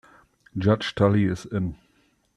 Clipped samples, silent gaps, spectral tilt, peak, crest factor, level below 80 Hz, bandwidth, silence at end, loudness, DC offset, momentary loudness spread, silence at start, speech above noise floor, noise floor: under 0.1%; none; -7.5 dB/octave; -6 dBFS; 20 dB; -52 dBFS; 10.5 kHz; 0.6 s; -24 LUFS; under 0.1%; 11 LU; 0.55 s; 42 dB; -65 dBFS